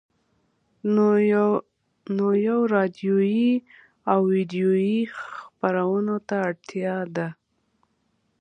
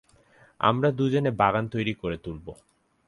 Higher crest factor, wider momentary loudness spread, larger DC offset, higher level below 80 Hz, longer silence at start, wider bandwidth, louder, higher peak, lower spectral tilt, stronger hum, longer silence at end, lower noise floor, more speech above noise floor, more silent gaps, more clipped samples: about the same, 18 dB vs 22 dB; second, 11 LU vs 15 LU; neither; second, -72 dBFS vs -54 dBFS; first, 0.85 s vs 0.6 s; second, 6.6 kHz vs 11.5 kHz; about the same, -23 LUFS vs -25 LUFS; about the same, -6 dBFS vs -6 dBFS; about the same, -8.5 dB/octave vs -7.5 dB/octave; neither; first, 1.05 s vs 0.55 s; first, -70 dBFS vs -58 dBFS; first, 48 dB vs 33 dB; neither; neither